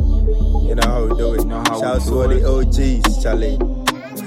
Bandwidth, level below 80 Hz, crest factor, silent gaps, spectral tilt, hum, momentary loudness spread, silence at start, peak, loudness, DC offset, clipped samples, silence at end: 15.5 kHz; -16 dBFS; 14 dB; none; -5.5 dB/octave; none; 3 LU; 0 s; 0 dBFS; -18 LUFS; under 0.1%; under 0.1%; 0 s